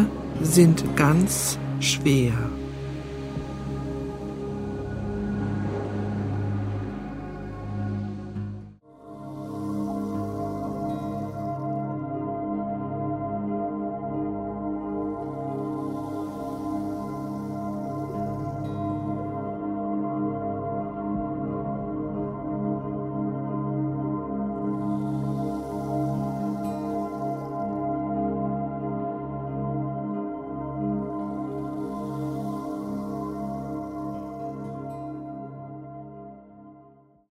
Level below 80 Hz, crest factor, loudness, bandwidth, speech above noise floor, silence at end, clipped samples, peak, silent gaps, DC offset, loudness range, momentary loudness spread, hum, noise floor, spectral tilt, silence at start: -48 dBFS; 24 dB; -29 LUFS; 16 kHz; 35 dB; 0.4 s; under 0.1%; -4 dBFS; none; under 0.1%; 6 LU; 10 LU; none; -55 dBFS; -6 dB/octave; 0 s